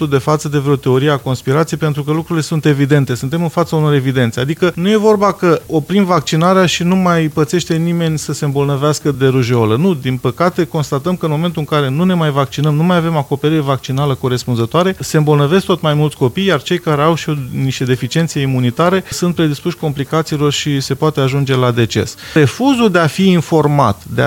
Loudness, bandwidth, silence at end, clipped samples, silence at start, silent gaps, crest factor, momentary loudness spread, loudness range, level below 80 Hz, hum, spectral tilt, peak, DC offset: -14 LUFS; 17 kHz; 0 s; under 0.1%; 0 s; none; 14 dB; 5 LU; 2 LU; -46 dBFS; none; -6 dB/octave; 0 dBFS; under 0.1%